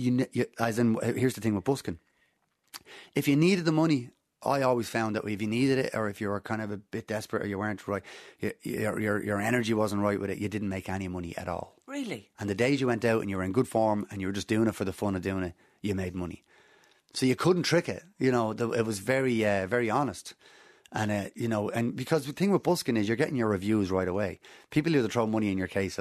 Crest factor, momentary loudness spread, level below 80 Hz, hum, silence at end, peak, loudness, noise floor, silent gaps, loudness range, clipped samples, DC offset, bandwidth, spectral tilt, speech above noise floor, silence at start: 20 dB; 11 LU; -62 dBFS; none; 0 s; -10 dBFS; -29 LUFS; -73 dBFS; none; 4 LU; under 0.1%; under 0.1%; 13.5 kHz; -6 dB/octave; 44 dB; 0 s